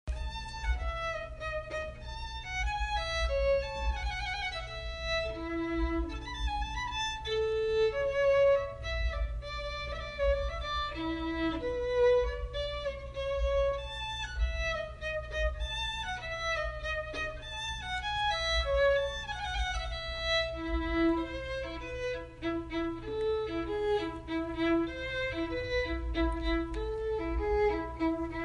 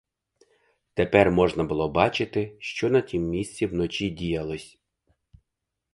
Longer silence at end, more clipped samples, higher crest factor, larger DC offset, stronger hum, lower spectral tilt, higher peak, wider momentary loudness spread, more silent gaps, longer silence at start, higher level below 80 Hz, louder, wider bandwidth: second, 0 s vs 1.25 s; neither; second, 16 dB vs 24 dB; neither; neither; about the same, -5 dB/octave vs -6 dB/octave; second, -16 dBFS vs -2 dBFS; about the same, 8 LU vs 10 LU; neither; second, 0.05 s vs 0.95 s; first, -40 dBFS vs -48 dBFS; second, -33 LUFS vs -25 LUFS; about the same, 10.5 kHz vs 11.5 kHz